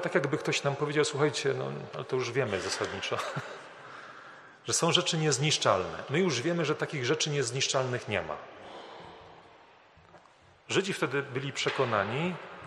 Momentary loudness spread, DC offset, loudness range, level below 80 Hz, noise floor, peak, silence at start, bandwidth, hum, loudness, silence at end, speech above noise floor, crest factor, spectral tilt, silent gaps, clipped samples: 20 LU; under 0.1%; 8 LU; -70 dBFS; -59 dBFS; -10 dBFS; 0 s; 13 kHz; none; -30 LUFS; 0 s; 29 dB; 22 dB; -3.5 dB/octave; none; under 0.1%